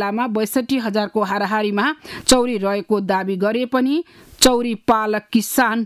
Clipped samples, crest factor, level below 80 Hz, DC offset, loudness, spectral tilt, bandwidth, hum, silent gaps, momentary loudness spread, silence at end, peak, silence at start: under 0.1%; 16 dB; -48 dBFS; under 0.1%; -19 LUFS; -3.5 dB/octave; 16 kHz; none; none; 6 LU; 0 s; -2 dBFS; 0 s